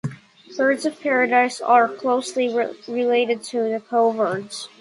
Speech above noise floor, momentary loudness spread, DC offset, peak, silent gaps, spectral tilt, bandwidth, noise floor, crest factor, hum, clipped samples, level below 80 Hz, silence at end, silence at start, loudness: 21 dB; 9 LU; under 0.1%; -4 dBFS; none; -4.5 dB/octave; 11.5 kHz; -41 dBFS; 18 dB; none; under 0.1%; -70 dBFS; 0.15 s; 0.05 s; -20 LUFS